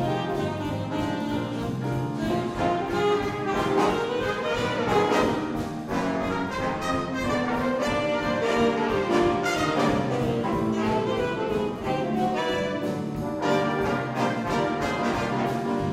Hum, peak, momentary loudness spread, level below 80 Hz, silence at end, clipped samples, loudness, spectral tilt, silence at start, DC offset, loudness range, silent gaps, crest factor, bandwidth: none; -10 dBFS; 5 LU; -48 dBFS; 0 s; under 0.1%; -26 LUFS; -6 dB/octave; 0 s; under 0.1%; 2 LU; none; 16 dB; 16 kHz